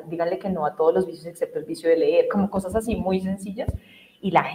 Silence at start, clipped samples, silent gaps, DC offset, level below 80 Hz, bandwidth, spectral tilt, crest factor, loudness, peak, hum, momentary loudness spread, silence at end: 0 s; under 0.1%; none; under 0.1%; -44 dBFS; 15.5 kHz; -7 dB/octave; 20 dB; -24 LUFS; -4 dBFS; none; 11 LU; 0 s